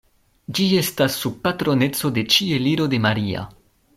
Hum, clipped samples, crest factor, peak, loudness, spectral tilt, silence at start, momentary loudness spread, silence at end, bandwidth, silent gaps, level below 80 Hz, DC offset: none; under 0.1%; 18 dB; -2 dBFS; -20 LUFS; -4.5 dB/octave; 0.5 s; 9 LU; 0.45 s; 16 kHz; none; -54 dBFS; under 0.1%